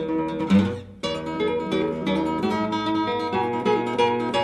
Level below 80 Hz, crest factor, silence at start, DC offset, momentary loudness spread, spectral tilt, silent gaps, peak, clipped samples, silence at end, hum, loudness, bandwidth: -52 dBFS; 16 dB; 0 s; under 0.1%; 7 LU; -6.5 dB/octave; none; -8 dBFS; under 0.1%; 0 s; none; -24 LUFS; 11.5 kHz